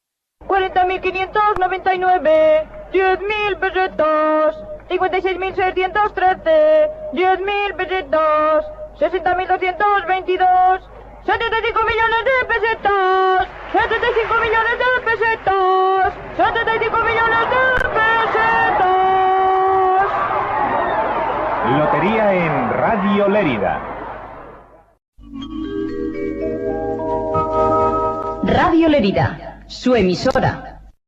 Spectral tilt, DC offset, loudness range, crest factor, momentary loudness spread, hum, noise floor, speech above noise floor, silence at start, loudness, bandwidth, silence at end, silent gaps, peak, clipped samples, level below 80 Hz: -6.5 dB/octave; under 0.1%; 5 LU; 12 dB; 8 LU; none; -43 dBFS; 27 dB; 0.4 s; -17 LUFS; 7.8 kHz; 0.2 s; 25.08-25.12 s; -4 dBFS; under 0.1%; -40 dBFS